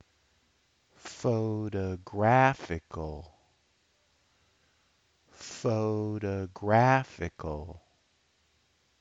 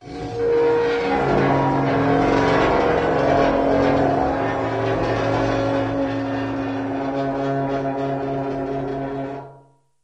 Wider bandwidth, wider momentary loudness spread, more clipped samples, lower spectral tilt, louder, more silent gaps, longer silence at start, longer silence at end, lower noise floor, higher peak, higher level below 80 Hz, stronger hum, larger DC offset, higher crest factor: about the same, 8 kHz vs 8.4 kHz; first, 21 LU vs 8 LU; neither; about the same, -7 dB/octave vs -7.5 dB/octave; second, -29 LUFS vs -20 LUFS; neither; first, 1.05 s vs 0 s; first, 1.2 s vs 0.45 s; first, -71 dBFS vs -52 dBFS; second, -8 dBFS vs -4 dBFS; second, -56 dBFS vs -40 dBFS; neither; neither; first, 22 dB vs 16 dB